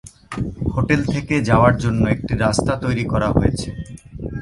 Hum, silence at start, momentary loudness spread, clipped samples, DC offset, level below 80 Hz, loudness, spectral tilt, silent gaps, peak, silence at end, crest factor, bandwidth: none; 0.05 s; 16 LU; under 0.1%; under 0.1%; -32 dBFS; -19 LUFS; -6.5 dB/octave; none; 0 dBFS; 0 s; 18 dB; 11.5 kHz